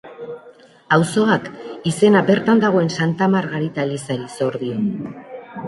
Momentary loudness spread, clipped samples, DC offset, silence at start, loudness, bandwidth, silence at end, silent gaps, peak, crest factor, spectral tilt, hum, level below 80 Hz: 19 LU; under 0.1%; under 0.1%; 0.05 s; -18 LUFS; 11.5 kHz; 0 s; none; -2 dBFS; 18 dB; -6 dB/octave; none; -60 dBFS